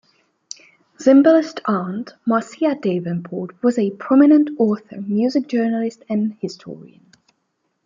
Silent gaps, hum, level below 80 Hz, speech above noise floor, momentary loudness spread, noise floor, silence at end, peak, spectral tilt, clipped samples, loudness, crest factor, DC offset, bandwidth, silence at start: none; none; -70 dBFS; 53 dB; 21 LU; -71 dBFS; 1 s; -2 dBFS; -7 dB/octave; under 0.1%; -18 LUFS; 16 dB; under 0.1%; 7.6 kHz; 1 s